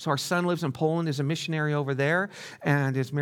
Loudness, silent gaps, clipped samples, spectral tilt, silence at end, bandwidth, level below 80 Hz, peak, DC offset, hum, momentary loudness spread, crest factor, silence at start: -27 LUFS; none; under 0.1%; -6 dB/octave; 0 s; 17 kHz; -74 dBFS; -10 dBFS; under 0.1%; none; 3 LU; 16 dB; 0 s